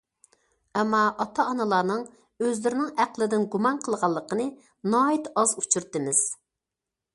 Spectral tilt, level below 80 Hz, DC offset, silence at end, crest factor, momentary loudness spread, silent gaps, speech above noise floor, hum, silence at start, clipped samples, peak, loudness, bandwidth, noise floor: -3.5 dB/octave; -70 dBFS; under 0.1%; 0.8 s; 20 dB; 7 LU; none; 62 dB; none; 0.75 s; under 0.1%; -6 dBFS; -25 LUFS; 11.5 kHz; -87 dBFS